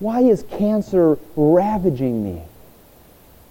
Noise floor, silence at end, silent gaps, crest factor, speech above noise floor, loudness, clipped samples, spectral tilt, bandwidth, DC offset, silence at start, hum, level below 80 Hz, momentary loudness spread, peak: -48 dBFS; 1 s; none; 14 dB; 30 dB; -18 LUFS; under 0.1%; -9 dB/octave; 17 kHz; under 0.1%; 0 s; none; -46 dBFS; 9 LU; -4 dBFS